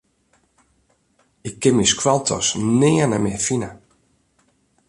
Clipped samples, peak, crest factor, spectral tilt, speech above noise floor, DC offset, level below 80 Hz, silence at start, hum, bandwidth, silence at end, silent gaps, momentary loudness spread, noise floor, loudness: under 0.1%; -2 dBFS; 18 dB; -4 dB/octave; 45 dB; under 0.1%; -50 dBFS; 1.45 s; none; 11.5 kHz; 1.15 s; none; 14 LU; -63 dBFS; -18 LUFS